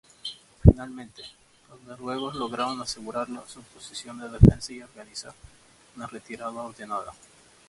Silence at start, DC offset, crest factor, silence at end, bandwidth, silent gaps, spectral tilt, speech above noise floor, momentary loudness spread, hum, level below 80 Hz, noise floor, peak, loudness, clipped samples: 0.25 s; under 0.1%; 26 dB; 0.55 s; 11.5 kHz; none; -7 dB/octave; 14 dB; 25 LU; none; -34 dBFS; -42 dBFS; 0 dBFS; -26 LUFS; under 0.1%